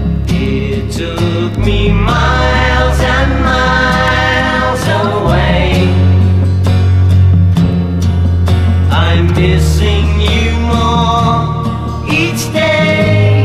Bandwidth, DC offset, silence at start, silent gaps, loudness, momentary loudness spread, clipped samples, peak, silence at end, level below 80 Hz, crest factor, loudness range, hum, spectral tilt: 13.5 kHz; under 0.1%; 0 s; none; -11 LUFS; 5 LU; under 0.1%; 0 dBFS; 0 s; -18 dBFS; 10 dB; 2 LU; none; -6 dB/octave